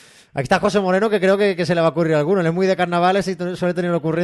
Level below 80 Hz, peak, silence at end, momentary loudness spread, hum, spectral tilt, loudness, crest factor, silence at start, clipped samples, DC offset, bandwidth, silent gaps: -54 dBFS; -4 dBFS; 0 s; 5 LU; none; -6.5 dB/octave; -18 LUFS; 14 dB; 0.35 s; under 0.1%; under 0.1%; 12 kHz; none